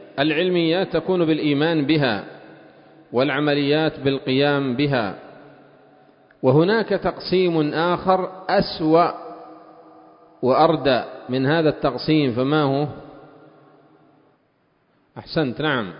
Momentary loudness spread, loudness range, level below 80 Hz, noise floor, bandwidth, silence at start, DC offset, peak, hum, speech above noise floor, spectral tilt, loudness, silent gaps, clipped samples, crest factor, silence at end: 9 LU; 3 LU; -54 dBFS; -64 dBFS; 5.4 kHz; 0 s; under 0.1%; -2 dBFS; none; 44 dB; -11 dB/octave; -20 LUFS; none; under 0.1%; 20 dB; 0 s